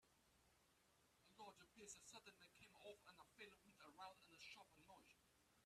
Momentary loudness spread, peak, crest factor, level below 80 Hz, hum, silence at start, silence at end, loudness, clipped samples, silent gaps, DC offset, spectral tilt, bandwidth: 7 LU; -44 dBFS; 22 dB; -90 dBFS; none; 0 s; 0 s; -64 LUFS; under 0.1%; none; under 0.1%; -2 dB/octave; 14 kHz